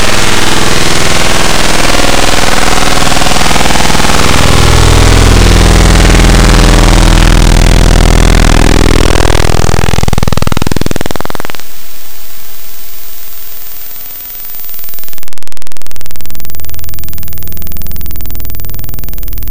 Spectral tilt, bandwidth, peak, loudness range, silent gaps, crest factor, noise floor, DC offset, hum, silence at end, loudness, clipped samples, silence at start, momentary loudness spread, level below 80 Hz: -4 dB/octave; 17 kHz; 0 dBFS; 16 LU; none; 6 dB; -31 dBFS; under 0.1%; none; 0 s; -8 LUFS; 5%; 0 s; 18 LU; -12 dBFS